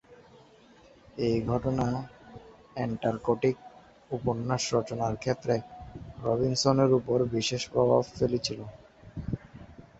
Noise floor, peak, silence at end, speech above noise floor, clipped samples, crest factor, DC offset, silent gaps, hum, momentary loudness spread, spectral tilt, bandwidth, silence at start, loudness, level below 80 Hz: -56 dBFS; -8 dBFS; 0.15 s; 29 dB; under 0.1%; 22 dB; under 0.1%; none; none; 20 LU; -5.5 dB/octave; 8.2 kHz; 0.1 s; -29 LUFS; -52 dBFS